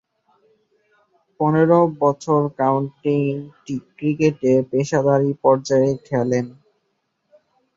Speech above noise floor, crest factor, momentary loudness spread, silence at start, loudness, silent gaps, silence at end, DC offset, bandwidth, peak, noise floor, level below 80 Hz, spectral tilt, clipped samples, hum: 53 dB; 18 dB; 9 LU; 1.4 s; -19 LUFS; none; 1.25 s; under 0.1%; 7.8 kHz; -2 dBFS; -71 dBFS; -62 dBFS; -7.5 dB/octave; under 0.1%; none